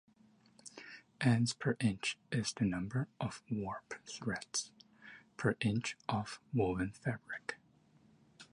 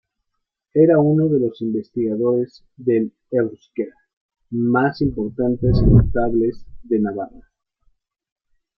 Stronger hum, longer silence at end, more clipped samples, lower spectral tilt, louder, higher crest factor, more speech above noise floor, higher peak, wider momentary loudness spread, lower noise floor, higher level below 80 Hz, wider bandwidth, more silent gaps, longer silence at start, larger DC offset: neither; second, 0.1 s vs 1.5 s; neither; second, -5 dB/octave vs -11.5 dB/octave; second, -37 LUFS vs -19 LUFS; about the same, 20 dB vs 18 dB; second, 31 dB vs 59 dB; second, -18 dBFS vs -2 dBFS; first, 20 LU vs 14 LU; second, -68 dBFS vs -77 dBFS; second, -64 dBFS vs -32 dBFS; first, 11 kHz vs 5.8 kHz; second, none vs 4.13-4.29 s; about the same, 0.65 s vs 0.75 s; neither